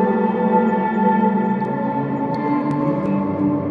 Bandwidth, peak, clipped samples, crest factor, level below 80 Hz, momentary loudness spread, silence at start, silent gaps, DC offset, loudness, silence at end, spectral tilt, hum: 4.8 kHz; -4 dBFS; under 0.1%; 14 dB; -56 dBFS; 5 LU; 0 s; none; under 0.1%; -19 LUFS; 0 s; -10 dB/octave; none